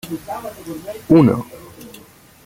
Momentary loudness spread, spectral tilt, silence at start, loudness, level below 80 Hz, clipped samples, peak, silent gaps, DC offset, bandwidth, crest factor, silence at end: 26 LU; -8 dB/octave; 0.05 s; -16 LUFS; -50 dBFS; under 0.1%; -2 dBFS; none; under 0.1%; 16.5 kHz; 18 dB; 0.55 s